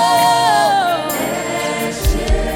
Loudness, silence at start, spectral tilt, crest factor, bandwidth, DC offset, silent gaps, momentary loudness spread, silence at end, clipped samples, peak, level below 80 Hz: -16 LUFS; 0 s; -3.5 dB/octave; 12 dB; 17.5 kHz; under 0.1%; none; 7 LU; 0 s; under 0.1%; -2 dBFS; -24 dBFS